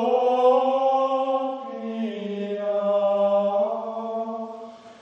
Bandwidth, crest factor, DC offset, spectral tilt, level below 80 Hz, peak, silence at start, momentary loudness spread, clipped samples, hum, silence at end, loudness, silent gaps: 6.8 kHz; 14 dB; under 0.1%; -7 dB/octave; -80 dBFS; -8 dBFS; 0 s; 13 LU; under 0.1%; none; 0.05 s; -23 LUFS; none